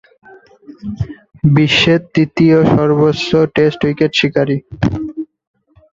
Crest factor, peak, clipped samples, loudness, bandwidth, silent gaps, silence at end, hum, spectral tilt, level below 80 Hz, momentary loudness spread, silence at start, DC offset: 14 dB; 0 dBFS; under 0.1%; -13 LUFS; 7.6 kHz; none; 0.7 s; none; -6.5 dB/octave; -40 dBFS; 15 LU; 0.7 s; under 0.1%